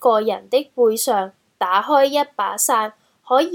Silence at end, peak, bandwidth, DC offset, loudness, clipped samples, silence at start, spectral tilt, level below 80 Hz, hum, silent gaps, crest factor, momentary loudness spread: 0 s; -2 dBFS; 18.5 kHz; under 0.1%; -19 LUFS; under 0.1%; 0 s; -2 dB/octave; -76 dBFS; none; none; 16 dB; 7 LU